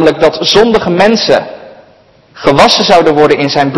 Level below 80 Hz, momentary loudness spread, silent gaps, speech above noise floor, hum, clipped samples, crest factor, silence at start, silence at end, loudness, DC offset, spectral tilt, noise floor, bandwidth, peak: -38 dBFS; 5 LU; none; 36 dB; none; 4%; 8 dB; 0 s; 0 s; -8 LUFS; under 0.1%; -4.5 dB/octave; -43 dBFS; 12 kHz; 0 dBFS